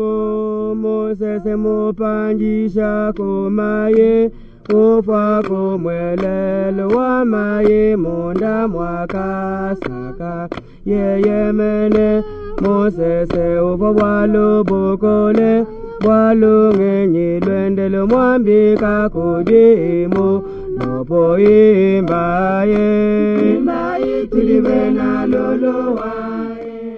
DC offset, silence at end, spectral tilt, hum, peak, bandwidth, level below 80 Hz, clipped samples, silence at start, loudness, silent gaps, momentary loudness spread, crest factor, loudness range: under 0.1%; 0 s; -10 dB/octave; none; 0 dBFS; 5.8 kHz; -36 dBFS; under 0.1%; 0 s; -15 LUFS; none; 9 LU; 14 dB; 5 LU